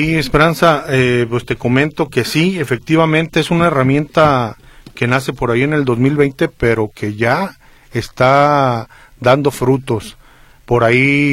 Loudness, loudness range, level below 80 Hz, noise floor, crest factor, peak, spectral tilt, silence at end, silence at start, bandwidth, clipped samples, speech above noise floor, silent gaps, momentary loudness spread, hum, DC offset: -14 LUFS; 2 LU; -38 dBFS; -44 dBFS; 14 dB; 0 dBFS; -6.5 dB/octave; 0 s; 0 s; 16 kHz; under 0.1%; 30 dB; none; 9 LU; none; under 0.1%